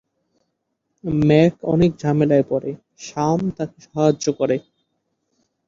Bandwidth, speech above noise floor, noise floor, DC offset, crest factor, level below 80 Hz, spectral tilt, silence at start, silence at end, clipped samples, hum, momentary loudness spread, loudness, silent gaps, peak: 7.6 kHz; 56 dB; -74 dBFS; under 0.1%; 18 dB; -48 dBFS; -7 dB/octave; 1.05 s; 1.05 s; under 0.1%; none; 15 LU; -19 LUFS; none; -2 dBFS